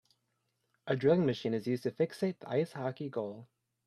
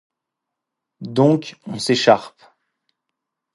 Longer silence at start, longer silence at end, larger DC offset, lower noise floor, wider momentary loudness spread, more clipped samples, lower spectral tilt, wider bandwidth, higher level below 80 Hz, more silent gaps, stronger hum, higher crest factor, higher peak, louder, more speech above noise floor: second, 0.85 s vs 1 s; second, 0.45 s vs 1.25 s; neither; about the same, -81 dBFS vs -82 dBFS; about the same, 12 LU vs 14 LU; neither; first, -7.5 dB/octave vs -5.5 dB/octave; first, 14 kHz vs 11.5 kHz; second, -76 dBFS vs -66 dBFS; neither; neither; about the same, 20 dB vs 20 dB; second, -14 dBFS vs 0 dBFS; second, -33 LUFS vs -18 LUFS; second, 48 dB vs 64 dB